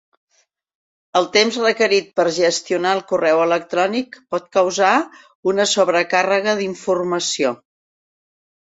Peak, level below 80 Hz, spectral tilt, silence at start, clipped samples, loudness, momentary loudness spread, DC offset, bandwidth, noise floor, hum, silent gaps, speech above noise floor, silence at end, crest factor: -2 dBFS; -66 dBFS; -3 dB/octave; 1.15 s; under 0.1%; -18 LUFS; 7 LU; under 0.1%; 8.2 kHz; -64 dBFS; none; 5.35-5.43 s; 47 dB; 1.1 s; 18 dB